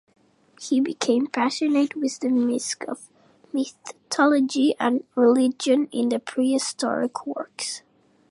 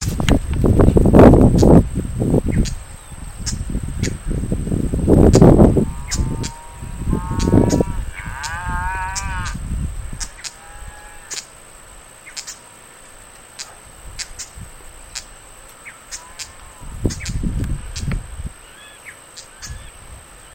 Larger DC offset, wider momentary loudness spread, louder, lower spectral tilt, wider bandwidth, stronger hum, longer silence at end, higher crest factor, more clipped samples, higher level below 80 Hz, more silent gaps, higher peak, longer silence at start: neither; second, 12 LU vs 26 LU; second, -23 LUFS vs -17 LUFS; second, -3 dB/octave vs -6.5 dB/octave; second, 11.5 kHz vs 17 kHz; neither; first, 0.5 s vs 0.35 s; about the same, 18 dB vs 18 dB; second, under 0.1% vs 0.2%; second, -78 dBFS vs -26 dBFS; neither; second, -4 dBFS vs 0 dBFS; first, 0.6 s vs 0 s